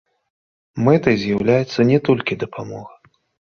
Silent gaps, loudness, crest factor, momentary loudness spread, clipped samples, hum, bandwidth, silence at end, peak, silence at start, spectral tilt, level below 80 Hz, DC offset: none; -18 LUFS; 18 dB; 17 LU; under 0.1%; none; 7 kHz; 0.65 s; -2 dBFS; 0.75 s; -7.5 dB/octave; -52 dBFS; under 0.1%